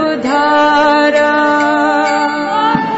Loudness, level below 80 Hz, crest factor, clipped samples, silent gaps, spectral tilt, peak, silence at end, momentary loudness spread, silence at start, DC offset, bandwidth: -11 LUFS; -50 dBFS; 10 dB; under 0.1%; none; -4.5 dB/octave; -2 dBFS; 0 s; 4 LU; 0 s; under 0.1%; 8 kHz